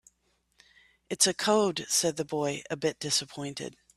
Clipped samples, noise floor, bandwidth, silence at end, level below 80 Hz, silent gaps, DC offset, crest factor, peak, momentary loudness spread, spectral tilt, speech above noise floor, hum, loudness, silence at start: under 0.1%; -73 dBFS; 14.5 kHz; 0.25 s; -70 dBFS; none; under 0.1%; 24 dB; -6 dBFS; 13 LU; -2.5 dB/octave; 44 dB; none; -28 LUFS; 1.1 s